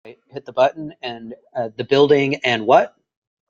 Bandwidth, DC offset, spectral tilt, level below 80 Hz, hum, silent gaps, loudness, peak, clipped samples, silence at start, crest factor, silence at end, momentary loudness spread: 7.6 kHz; under 0.1%; -5.5 dB/octave; -64 dBFS; none; none; -18 LUFS; -2 dBFS; under 0.1%; 0.05 s; 18 dB; 0.65 s; 17 LU